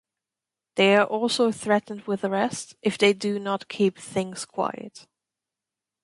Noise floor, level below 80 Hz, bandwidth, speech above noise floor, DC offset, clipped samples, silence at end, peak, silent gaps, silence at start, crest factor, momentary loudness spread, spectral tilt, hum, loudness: -89 dBFS; -70 dBFS; 11.5 kHz; 65 dB; under 0.1%; under 0.1%; 1.05 s; -6 dBFS; none; 0.75 s; 20 dB; 11 LU; -4.5 dB/octave; none; -24 LUFS